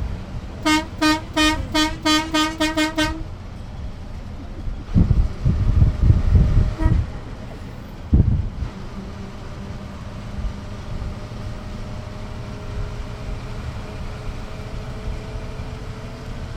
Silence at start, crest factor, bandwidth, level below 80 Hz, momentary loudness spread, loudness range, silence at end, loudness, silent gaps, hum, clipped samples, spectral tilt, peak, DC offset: 0 s; 20 dB; 16 kHz; -26 dBFS; 16 LU; 12 LU; 0 s; -23 LUFS; none; none; under 0.1%; -5.5 dB/octave; -2 dBFS; under 0.1%